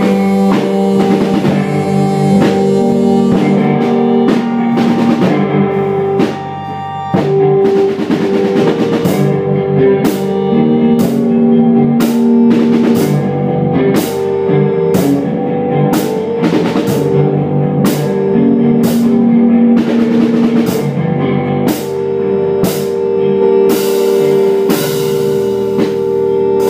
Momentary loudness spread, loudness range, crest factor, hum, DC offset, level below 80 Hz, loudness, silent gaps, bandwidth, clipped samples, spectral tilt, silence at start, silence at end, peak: 5 LU; 2 LU; 10 dB; none; under 0.1%; -48 dBFS; -12 LUFS; none; 16 kHz; under 0.1%; -7 dB/octave; 0 s; 0 s; 0 dBFS